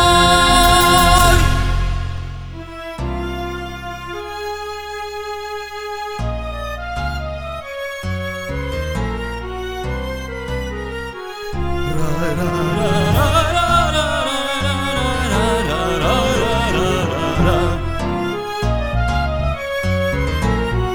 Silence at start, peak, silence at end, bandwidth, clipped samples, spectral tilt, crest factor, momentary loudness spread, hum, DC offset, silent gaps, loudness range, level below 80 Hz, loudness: 0 s; 0 dBFS; 0 s; over 20 kHz; under 0.1%; -4.5 dB/octave; 18 dB; 16 LU; none; under 0.1%; none; 10 LU; -26 dBFS; -18 LUFS